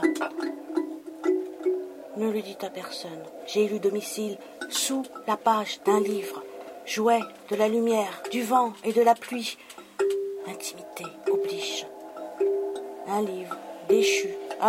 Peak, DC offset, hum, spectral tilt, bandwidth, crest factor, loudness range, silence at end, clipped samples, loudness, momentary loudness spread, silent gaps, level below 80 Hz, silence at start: -8 dBFS; under 0.1%; none; -3.5 dB/octave; 16 kHz; 18 dB; 5 LU; 0 s; under 0.1%; -27 LUFS; 14 LU; none; -80 dBFS; 0 s